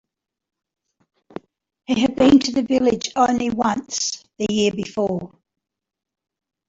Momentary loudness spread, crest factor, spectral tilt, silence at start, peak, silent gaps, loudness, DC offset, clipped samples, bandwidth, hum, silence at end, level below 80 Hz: 24 LU; 18 dB; -4 dB/octave; 1.9 s; -4 dBFS; none; -20 LUFS; under 0.1%; under 0.1%; 7.8 kHz; none; 1.4 s; -52 dBFS